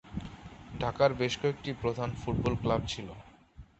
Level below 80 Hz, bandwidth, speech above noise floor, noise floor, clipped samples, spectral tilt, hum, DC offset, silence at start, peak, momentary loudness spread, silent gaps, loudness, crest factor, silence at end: -48 dBFS; 8.4 kHz; 23 dB; -54 dBFS; under 0.1%; -6 dB/octave; none; under 0.1%; 0.05 s; -10 dBFS; 19 LU; none; -32 LUFS; 22 dB; 0.15 s